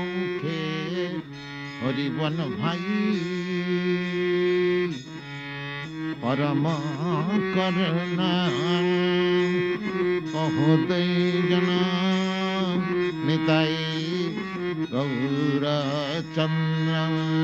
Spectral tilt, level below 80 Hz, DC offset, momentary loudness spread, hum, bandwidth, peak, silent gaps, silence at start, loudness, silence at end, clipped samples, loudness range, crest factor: -7 dB/octave; -60 dBFS; under 0.1%; 8 LU; none; 7.8 kHz; -6 dBFS; none; 0 s; -25 LUFS; 0 s; under 0.1%; 4 LU; 18 dB